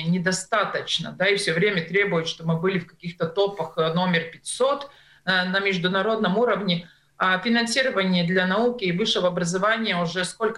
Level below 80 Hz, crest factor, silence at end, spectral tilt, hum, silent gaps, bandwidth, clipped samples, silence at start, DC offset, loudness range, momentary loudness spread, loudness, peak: -62 dBFS; 16 dB; 0 s; -4.5 dB/octave; none; none; 12 kHz; under 0.1%; 0 s; under 0.1%; 2 LU; 5 LU; -23 LUFS; -6 dBFS